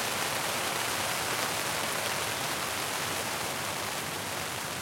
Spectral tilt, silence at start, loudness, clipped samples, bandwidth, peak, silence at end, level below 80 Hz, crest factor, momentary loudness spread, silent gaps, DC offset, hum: -1.5 dB/octave; 0 s; -30 LUFS; under 0.1%; 16.5 kHz; -10 dBFS; 0 s; -64 dBFS; 22 dB; 4 LU; none; under 0.1%; none